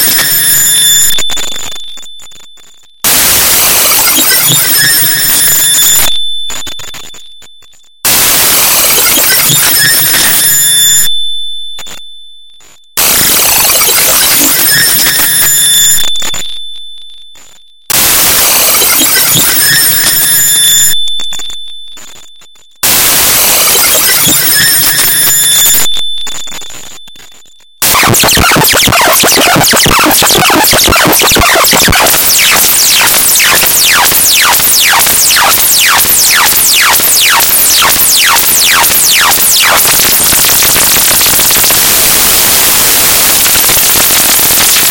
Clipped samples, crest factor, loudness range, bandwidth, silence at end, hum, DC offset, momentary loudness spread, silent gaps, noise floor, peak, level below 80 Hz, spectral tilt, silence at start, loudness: 2%; 8 dB; 4 LU; over 20 kHz; 0 s; none; under 0.1%; 10 LU; none; -40 dBFS; 0 dBFS; -32 dBFS; 0 dB/octave; 0 s; -3 LUFS